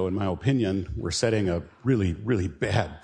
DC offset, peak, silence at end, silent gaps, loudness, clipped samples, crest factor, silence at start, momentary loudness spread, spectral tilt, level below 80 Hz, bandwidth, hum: under 0.1%; -8 dBFS; 0.05 s; none; -26 LUFS; under 0.1%; 16 dB; 0 s; 5 LU; -6 dB/octave; -44 dBFS; 10.5 kHz; none